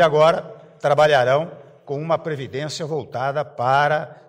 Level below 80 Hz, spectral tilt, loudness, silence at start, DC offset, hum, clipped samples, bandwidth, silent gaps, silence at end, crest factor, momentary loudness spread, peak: -62 dBFS; -5 dB/octave; -20 LUFS; 0 s; under 0.1%; none; under 0.1%; 10.5 kHz; none; 0.15 s; 14 dB; 13 LU; -6 dBFS